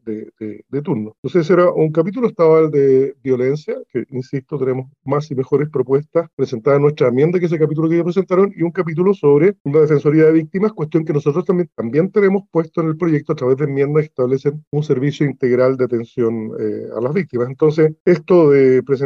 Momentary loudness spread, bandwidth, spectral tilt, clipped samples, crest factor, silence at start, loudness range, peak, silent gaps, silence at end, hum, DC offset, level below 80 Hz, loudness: 10 LU; 7 kHz; -9 dB/octave; under 0.1%; 12 dB; 0.05 s; 4 LU; -4 dBFS; 1.18-1.23 s, 6.33-6.37 s, 9.60-9.65 s, 14.67-14.71 s, 18.00-18.05 s; 0 s; none; under 0.1%; -62 dBFS; -16 LUFS